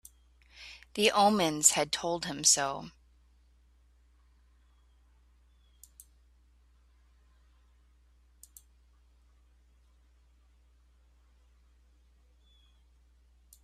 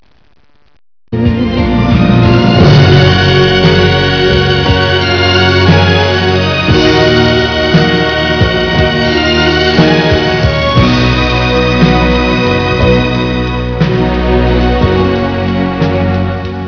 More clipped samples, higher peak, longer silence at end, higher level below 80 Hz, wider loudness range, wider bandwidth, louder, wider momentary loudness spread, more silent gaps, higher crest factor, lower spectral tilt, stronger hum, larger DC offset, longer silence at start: second, under 0.1% vs 0.9%; second, -6 dBFS vs 0 dBFS; first, 10.75 s vs 0 s; second, -64 dBFS vs -20 dBFS; first, 6 LU vs 3 LU; first, 14 kHz vs 5.4 kHz; second, -27 LUFS vs -9 LUFS; first, 25 LU vs 5 LU; neither; first, 30 dB vs 8 dB; second, -1.5 dB/octave vs -6.5 dB/octave; neither; second, under 0.1% vs 0.6%; second, 0.6 s vs 1.1 s